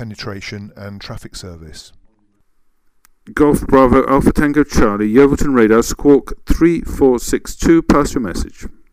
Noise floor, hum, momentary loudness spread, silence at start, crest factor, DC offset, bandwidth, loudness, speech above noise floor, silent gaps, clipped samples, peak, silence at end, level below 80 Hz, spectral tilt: -57 dBFS; none; 19 LU; 0 s; 14 dB; under 0.1%; 16 kHz; -13 LUFS; 43 dB; none; under 0.1%; -2 dBFS; 0.2 s; -28 dBFS; -6 dB/octave